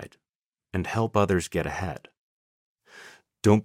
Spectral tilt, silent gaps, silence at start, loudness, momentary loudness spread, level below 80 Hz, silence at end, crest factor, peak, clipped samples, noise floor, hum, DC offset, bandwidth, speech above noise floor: -6.5 dB/octave; 0.36-0.53 s, 2.17-2.76 s; 0 s; -27 LUFS; 24 LU; -52 dBFS; 0 s; 22 dB; -6 dBFS; under 0.1%; under -90 dBFS; none; under 0.1%; 15.5 kHz; over 64 dB